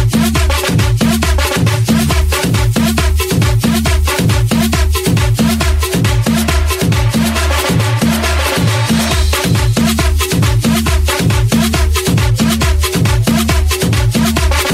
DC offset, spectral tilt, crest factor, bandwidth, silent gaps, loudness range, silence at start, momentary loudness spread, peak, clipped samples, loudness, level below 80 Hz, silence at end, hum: under 0.1%; -5 dB/octave; 10 dB; 16.5 kHz; none; 0 LU; 0 s; 1 LU; 0 dBFS; under 0.1%; -12 LUFS; -18 dBFS; 0 s; none